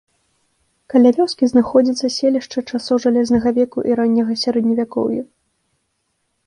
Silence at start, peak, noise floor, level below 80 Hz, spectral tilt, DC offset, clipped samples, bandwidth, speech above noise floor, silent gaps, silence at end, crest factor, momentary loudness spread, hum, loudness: 0.95 s; -2 dBFS; -70 dBFS; -54 dBFS; -5.5 dB/octave; under 0.1%; under 0.1%; 10.5 kHz; 54 dB; none; 1.2 s; 16 dB; 8 LU; none; -17 LUFS